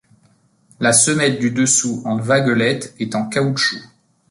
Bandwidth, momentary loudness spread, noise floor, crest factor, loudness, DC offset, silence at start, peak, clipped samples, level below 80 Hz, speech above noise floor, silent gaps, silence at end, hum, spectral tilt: 11.5 kHz; 10 LU; -57 dBFS; 18 dB; -16 LUFS; under 0.1%; 0.8 s; 0 dBFS; under 0.1%; -60 dBFS; 40 dB; none; 0.45 s; none; -3.5 dB/octave